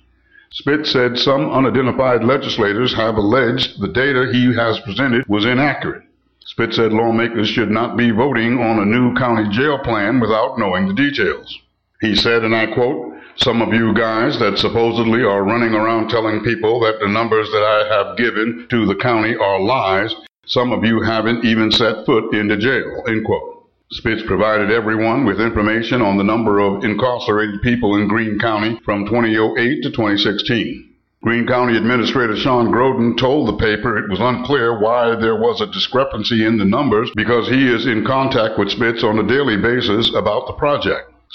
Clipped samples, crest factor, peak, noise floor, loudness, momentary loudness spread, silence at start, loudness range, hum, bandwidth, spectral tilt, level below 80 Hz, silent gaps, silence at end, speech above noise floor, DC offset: under 0.1%; 12 dB; -4 dBFS; -51 dBFS; -16 LUFS; 5 LU; 0.55 s; 2 LU; none; 7.8 kHz; -6.5 dB/octave; -44 dBFS; none; 0.3 s; 35 dB; 0.2%